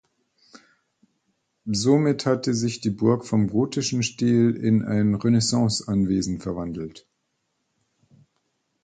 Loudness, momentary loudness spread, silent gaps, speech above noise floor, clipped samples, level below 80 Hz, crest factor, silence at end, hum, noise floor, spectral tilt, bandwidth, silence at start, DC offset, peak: -23 LUFS; 10 LU; none; 53 dB; under 0.1%; -52 dBFS; 18 dB; 1.85 s; none; -75 dBFS; -5.5 dB/octave; 9.4 kHz; 1.65 s; under 0.1%; -6 dBFS